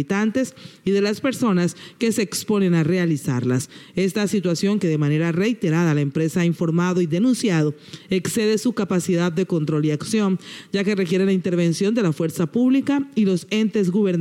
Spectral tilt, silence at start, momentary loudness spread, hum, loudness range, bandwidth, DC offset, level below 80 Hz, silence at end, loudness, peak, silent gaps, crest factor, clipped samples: -6 dB/octave; 0 s; 5 LU; none; 1 LU; 16 kHz; under 0.1%; -62 dBFS; 0 s; -21 LUFS; -10 dBFS; none; 10 dB; under 0.1%